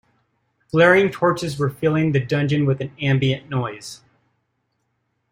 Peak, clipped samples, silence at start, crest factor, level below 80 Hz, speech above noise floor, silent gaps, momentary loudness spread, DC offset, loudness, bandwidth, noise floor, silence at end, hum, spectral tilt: -2 dBFS; under 0.1%; 0.75 s; 18 dB; -56 dBFS; 53 dB; none; 12 LU; under 0.1%; -19 LUFS; 15.5 kHz; -72 dBFS; 1.35 s; none; -6.5 dB/octave